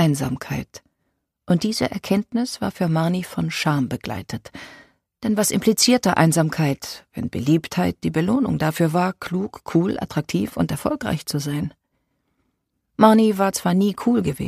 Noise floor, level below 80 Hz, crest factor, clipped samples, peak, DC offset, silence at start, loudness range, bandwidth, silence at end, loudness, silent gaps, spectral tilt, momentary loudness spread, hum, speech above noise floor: -74 dBFS; -50 dBFS; 20 dB; under 0.1%; 0 dBFS; under 0.1%; 0 s; 5 LU; 15.5 kHz; 0 s; -21 LUFS; none; -5.5 dB/octave; 13 LU; none; 53 dB